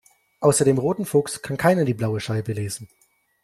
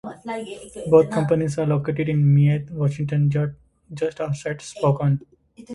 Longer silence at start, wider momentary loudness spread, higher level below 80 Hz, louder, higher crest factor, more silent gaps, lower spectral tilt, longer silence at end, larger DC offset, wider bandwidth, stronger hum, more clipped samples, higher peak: first, 0.4 s vs 0.05 s; second, 10 LU vs 15 LU; about the same, -56 dBFS vs -54 dBFS; about the same, -22 LUFS vs -22 LUFS; about the same, 18 dB vs 18 dB; neither; second, -5.5 dB/octave vs -8 dB/octave; first, 0.55 s vs 0 s; neither; first, 15 kHz vs 11.5 kHz; neither; neither; about the same, -4 dBFS vs -2 dBFS